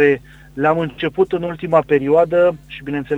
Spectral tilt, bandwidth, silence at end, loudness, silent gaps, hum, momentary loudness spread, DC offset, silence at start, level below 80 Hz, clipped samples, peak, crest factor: -8 dB/octave; 8 kHz; 0 s; -17 LUFS; none; none; 11 LU; under 0.1%; 0 s; -48 dBFS; under 0.1%; -2 dBFS; 16 dB